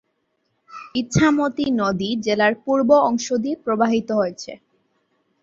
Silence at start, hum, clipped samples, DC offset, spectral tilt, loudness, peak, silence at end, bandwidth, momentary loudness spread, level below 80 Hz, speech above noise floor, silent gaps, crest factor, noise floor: 0.7 s; none; under 0.1%; under 0.1%; -5.5 dB/octave; -20 LUFS; -2 dBFS; 0.85 s; 7.8 kHz; 11 LU; -52 dBFS; 51 dB; none; 18 dB; -71 dBFS